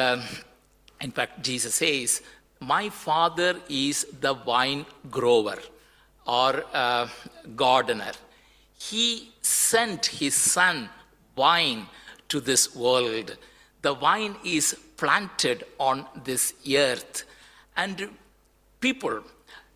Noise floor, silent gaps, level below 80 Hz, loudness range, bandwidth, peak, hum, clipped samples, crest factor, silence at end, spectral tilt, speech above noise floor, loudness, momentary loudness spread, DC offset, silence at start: -61 dBFS; none; -64 dBFS; 4 LU; 16 kHz; -6 dBFS; none; under 0.1%; 20 dB; 0.15 s; -1.5 dB/octave; 36 dB; -24 LUFS; 15 LU; under 0.1%; 0 s